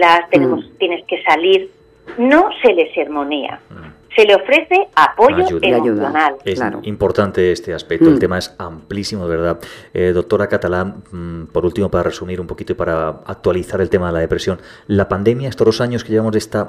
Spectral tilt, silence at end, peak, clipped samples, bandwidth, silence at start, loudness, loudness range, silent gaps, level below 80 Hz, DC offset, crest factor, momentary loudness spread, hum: -6 dB/octave; 0 s; 0 dBFS; under 0.1%; 14.5 kHz; 0 s; -15 LUFS; 6 LU; none; -42 dBFS; under 0.1%; 16 dB; 14 LU; none